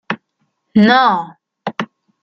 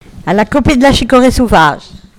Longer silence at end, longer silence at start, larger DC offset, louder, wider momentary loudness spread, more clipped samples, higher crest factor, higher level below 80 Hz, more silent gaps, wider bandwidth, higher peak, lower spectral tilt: first, 0.4 s vs 0.2 s; about the same, 0.1 s vs 0.15 s; neither; second, -15 LUFS vs -9 LUFS; first, 19 LU vs 6 LU; second, under 0.1% vs 0.9%; first, 16 dB vs 10 dB; second, -60 dBFS vs -24 dBFS; neither; second, 6.6 kHz vs 16.5 kHz; about the same, 0 dBFS vs 0 dBFS; first, -6.5 dB/octave vs -5 dB/octave